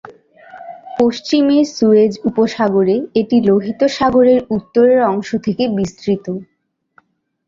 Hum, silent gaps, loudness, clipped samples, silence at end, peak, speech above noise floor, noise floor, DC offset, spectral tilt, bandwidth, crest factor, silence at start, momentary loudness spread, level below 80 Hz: none; none; -14 LUFS; under 0.1%; 1.05 s; -2 dBFS; 41 dB; -55 dBFS; under 0.1%; -6.5 dB/octave; 7.6 kHz; 14 dB; 0.05 s; 9 LU; -52 dBFS